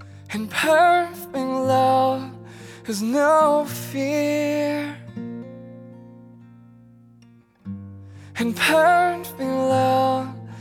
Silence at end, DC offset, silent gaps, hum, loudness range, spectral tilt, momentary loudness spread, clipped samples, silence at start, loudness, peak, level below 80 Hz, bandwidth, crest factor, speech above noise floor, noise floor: 0 s; under 0.1%; none; none; 15 LU; -5 dB/octave; 21 LU; under 0.1%; 0 s; -20 LUFS; -6 dBFS; -66 dBFS; 19 kHz; 16 dB; 32 dB; -52 dBFS